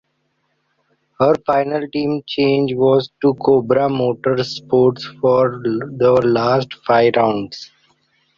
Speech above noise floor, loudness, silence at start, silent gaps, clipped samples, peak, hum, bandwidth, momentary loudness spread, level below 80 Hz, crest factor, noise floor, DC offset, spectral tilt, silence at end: 51 dB; -16 LUFS; 1.2 s; none; under 0.1%; -2 dBFS; none; 7.4 kHz; 7 LU; -54 dBFS; 16 dB; -67 dBFS; under 0.1%; -7.5 dB/octave; 0.75 s